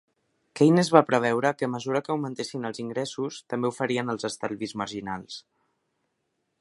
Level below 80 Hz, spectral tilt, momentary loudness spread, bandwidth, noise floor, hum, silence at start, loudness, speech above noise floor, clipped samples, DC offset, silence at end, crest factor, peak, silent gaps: -68 dBFS; -5.5 dB/octave; 14 LU; 11.5 kHz; -77 dBFS; none; 0.55 s; -26 LUFS; 52 dB; under 0.1%; under 0.1%; 1.2 s; 26 dB; 0 dBFS; none